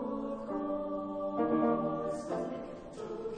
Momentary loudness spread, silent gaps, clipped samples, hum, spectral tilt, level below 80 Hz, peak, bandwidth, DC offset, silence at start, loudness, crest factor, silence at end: 13 LU; none; under 0.1%; none; -7.5 dB/octave; -60 dBFS; -18 dBFS; 9.8 kHz; under 0.1%; 0 s; -35 LUFS; 16 dB; 0 s